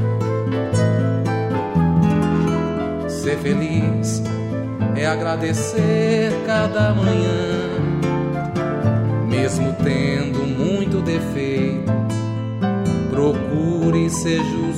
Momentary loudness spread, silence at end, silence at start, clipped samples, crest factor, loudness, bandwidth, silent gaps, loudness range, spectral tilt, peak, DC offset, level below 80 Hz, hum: 5 LU; 0 s; 0 s; under 0.1%; 14 dB; -20 LUFS; 12.5 kHz; none; 2 LU; -6.5 dB/octave; -6 dBFS; under 0.1%; -42 dBFS; none